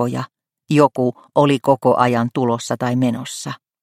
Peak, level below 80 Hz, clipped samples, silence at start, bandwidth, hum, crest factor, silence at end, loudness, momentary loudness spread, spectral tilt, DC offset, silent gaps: 0 dBFS; -60 dBFS; under 0.1%; 0 s; 15 kHz; none; 18 dB; 0.3 s; -18 LUFS; 13 LU; -6 dB/octave; under 0.1%; none